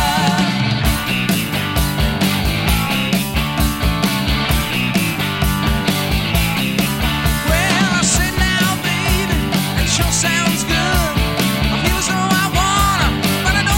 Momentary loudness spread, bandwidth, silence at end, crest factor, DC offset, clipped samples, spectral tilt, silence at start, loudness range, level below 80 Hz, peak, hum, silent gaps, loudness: 3 LU; 17 kHz; 0 s; 14 dB; under 0.1%; under 0.1%; -4 dB/octave; 0 s; 2 LU; -24 dBFS; -2 dBFS; none; none; -16 LUFS